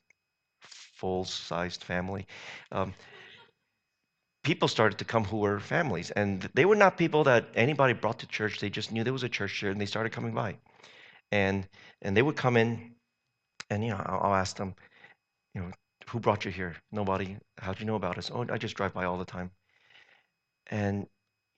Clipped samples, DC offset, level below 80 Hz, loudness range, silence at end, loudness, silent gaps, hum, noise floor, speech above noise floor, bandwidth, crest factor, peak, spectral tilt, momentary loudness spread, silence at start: under 0.1%; under 0.1%; -64 dBFS; 10 LU; 0.5 s; -30 LUFS; none; none; -82 dBFS; 52 dB; 8.8 kHz; 26 dB; -4 dBFS; -6 dB/octave; 16 LU; 0.65 s